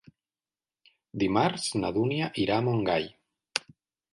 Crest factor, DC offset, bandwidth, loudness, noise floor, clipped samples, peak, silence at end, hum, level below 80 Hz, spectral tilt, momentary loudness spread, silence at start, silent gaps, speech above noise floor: 24 dB; under 0.1%; 11.5 kHz; -28 LUFS; under -90 dBFS; under 0.1%; -6 dBFS; 0.55 s; none; -60 dBFS; -5 dB/octave; 8 LU; 1.15 s; none; over 63 dB